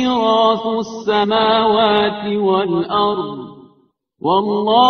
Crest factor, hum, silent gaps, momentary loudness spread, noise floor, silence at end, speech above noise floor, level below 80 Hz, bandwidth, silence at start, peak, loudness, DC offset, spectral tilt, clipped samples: 16 dB; none; none; 10 LU; -58 dBFS; 0 s; 42 dB; -54 dBFS; 6.6 kHz; 0 s; 0 dBFS; -16 LUFS; under 0.1%; -3 dB/octave; under 0.1%